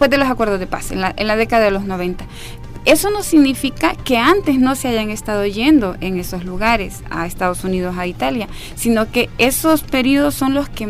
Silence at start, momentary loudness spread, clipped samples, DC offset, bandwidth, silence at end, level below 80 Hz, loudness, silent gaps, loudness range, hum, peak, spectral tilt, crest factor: 0 s; 11 LU; under 0.1%; under 0.1%; 16 kHz; 0 s; -32 dBFS; -16 LUFS; none; 3 LU; none; -2 dBFS; -4.5 dB/octave; 14 dB